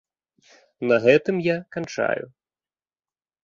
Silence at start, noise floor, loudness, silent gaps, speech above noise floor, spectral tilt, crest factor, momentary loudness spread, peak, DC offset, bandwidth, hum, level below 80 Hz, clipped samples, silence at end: 0.8 s; under -90 dBFS; -22 LUFS; none; over 69 dB; -6 dB/octave; 22 dB; 13 LU; -4 dBFS; under 0.1%; 7.4 kHz; none; -66 dBFS; under 0.1%; 1.2 s